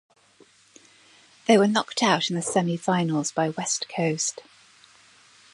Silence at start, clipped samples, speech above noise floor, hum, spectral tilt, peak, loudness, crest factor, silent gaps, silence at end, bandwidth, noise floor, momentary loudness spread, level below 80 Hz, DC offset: 1.5 s; under 0.1%; 34 dB; none; -4 dB/octave; -4 dBFS; -24 LUFS; 22 dB; none; 1.1 s; 11.5 kHz; -57 dBFS; 8 LU; -74 dBFS; under 0.1%